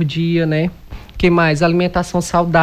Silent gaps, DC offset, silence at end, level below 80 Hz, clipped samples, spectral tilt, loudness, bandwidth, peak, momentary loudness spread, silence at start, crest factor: none; under 0.1%; 0 s; -34 dBFS; under 0.1%; -6 dB/octave; -16 LUFS; 13.5 kHz; -2 dBFS; 6 LU; 0 s; 12 dB